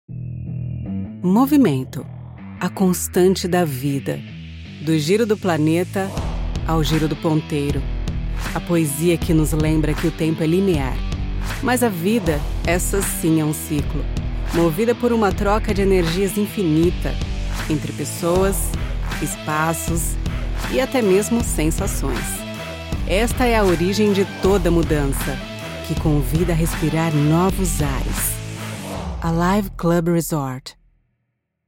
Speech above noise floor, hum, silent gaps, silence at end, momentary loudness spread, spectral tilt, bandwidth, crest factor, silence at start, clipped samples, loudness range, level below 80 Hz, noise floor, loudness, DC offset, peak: 55 dB; none; none; 0.95 s; 11 LU; -5.5 dB/octave; 17 kHz; 14 dB; 0.1 s; under 0.1%; 2 LU; -28 dBFS; -74 dBFS; -20 LUFS; under 0.1%; -4 dBFS